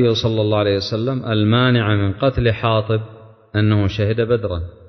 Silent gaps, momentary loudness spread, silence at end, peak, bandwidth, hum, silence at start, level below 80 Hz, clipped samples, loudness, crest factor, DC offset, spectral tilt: none; 7 LU; 0.2 s; -4 dBFS; 6.4 kHz; none; 0 s; -36 dBFS; under 0.1%; -18 LUFS; 14 dB; under 0.1%; -7.5 dB/octave